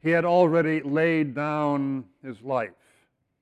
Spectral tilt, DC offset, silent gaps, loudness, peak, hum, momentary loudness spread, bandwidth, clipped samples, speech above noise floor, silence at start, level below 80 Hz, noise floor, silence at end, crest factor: -8.5 dB/octave; under 0.1%; none; -24 LUFS; -8 dBFS; none; 15 LU; 8.6 kHz; under 0.1%; 43 dB; 0.05 s; -70 dBFS; -67 dBFS; 0.7 s; 16 dB